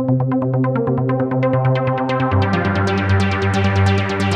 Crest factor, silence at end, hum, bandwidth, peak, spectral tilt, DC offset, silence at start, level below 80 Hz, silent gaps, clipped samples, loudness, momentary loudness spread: 12 dB; 0 s; none; 9.4 kHz; -4 dBFS; -7.5 dB/octave; under 0.1%; 0 s; -46 dBFS; none; under 0.1%; -17 LUFS; 2 LU